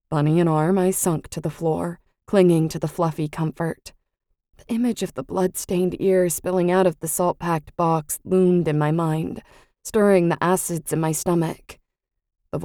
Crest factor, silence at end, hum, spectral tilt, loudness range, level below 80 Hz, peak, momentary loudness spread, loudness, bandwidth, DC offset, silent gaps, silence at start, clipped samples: 18 dB; 0 s; none; -6 dB/octave; 3 LU; -52 dBFS; -4 dBFS; 10 LU; -22 LUFS; 18 kHz; under 0.1%; none; 0.1 s; under 0.1%